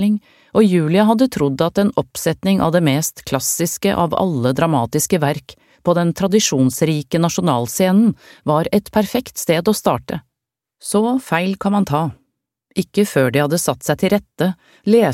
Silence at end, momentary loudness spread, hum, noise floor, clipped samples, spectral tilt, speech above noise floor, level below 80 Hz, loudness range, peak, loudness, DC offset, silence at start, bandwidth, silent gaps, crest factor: 0 s; 7 LU; none; -82 dBFS; under 0.1%; -5.5 dB/octave; 66 dB; -50 dBFS; 3 LU; 0 dBFS; -17 LUFS; under 0.1%; 0 s; 16.5 kHz; none; 16 dB